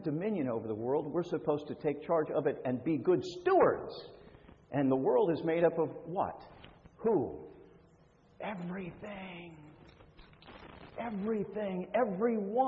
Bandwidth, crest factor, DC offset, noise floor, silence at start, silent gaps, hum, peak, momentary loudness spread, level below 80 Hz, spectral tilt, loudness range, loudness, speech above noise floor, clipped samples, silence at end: 7.4 kHz; 20 dB; under 0.1%; -63 dBFS; 0 s; none; none; -14 dBFS; 19 LU; -66 dBFS; -8 dB/octave; 13 LU; -33 LUFS; 31 dB; under 0.1%; 0 s